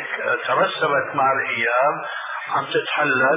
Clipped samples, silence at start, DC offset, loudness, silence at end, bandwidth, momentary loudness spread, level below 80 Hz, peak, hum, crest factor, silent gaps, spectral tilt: under 0.1%; 0 s; under 0.1%; -20 LUFS; 0 s; 4 kHz; 6 LU; -78 dBFS; -6 dBFS; none; 14 dB; none; -7.5 dB/octave